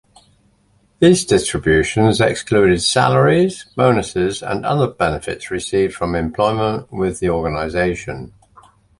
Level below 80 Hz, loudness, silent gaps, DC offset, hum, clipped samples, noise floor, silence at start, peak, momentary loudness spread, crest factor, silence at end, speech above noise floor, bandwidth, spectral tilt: -38 dBFS; -17 LUFS; none; under 0.1%; none; under 0.1%; -57 dBFS; 1 s; 0 dBFS; 9 LU; 16 dB; 0.7 s; 41 dB; 11.5 kHz; -5 dB/octave